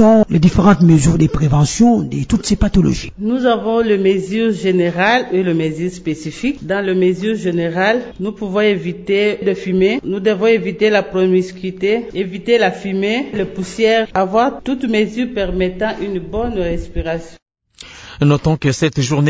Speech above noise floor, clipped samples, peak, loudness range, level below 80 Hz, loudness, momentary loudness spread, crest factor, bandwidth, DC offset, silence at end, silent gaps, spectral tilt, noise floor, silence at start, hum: 25 dB; under 0.1%; 0 dBFS; 5 LU; -32 dBFS; -16 LUFS; 10 LU; 14 dB; 8 kHz; under 0.1%; 0 s; 17.42-17.46 s; -6.5 dB/octave; -40 dBFS; 0 s; none